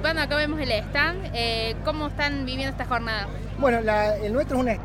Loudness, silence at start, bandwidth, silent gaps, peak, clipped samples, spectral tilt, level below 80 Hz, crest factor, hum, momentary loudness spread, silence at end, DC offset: -25 LUFS; 0 s; 16 kHz; none; -8 dBFS; under 0.1%; -5.5 dB/octave; -36 dBFS; 16 dB; 50 Hz at -40 dBFS; 6 LU; 0 s; under 0.1%